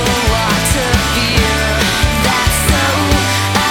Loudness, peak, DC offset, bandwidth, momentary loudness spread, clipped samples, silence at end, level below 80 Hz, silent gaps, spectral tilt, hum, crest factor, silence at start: -13 LUFS; 0 dBFS; under 0.1%; over 20 kHz; 1 LU; under 0.1%; 0 s; -20 dBFS; none; -3.5 dB/octave; none; 12 dB; 0 s